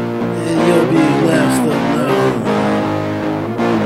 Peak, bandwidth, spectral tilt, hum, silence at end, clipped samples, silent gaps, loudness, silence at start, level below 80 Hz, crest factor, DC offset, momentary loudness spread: 0 dBFS; 16 kHz; -6 dB/octave; none; 0 s; under 0.1%; none; -15 LUFS; 0 s; -46 dBFS; 14 dB; under 0.1%; 7 LU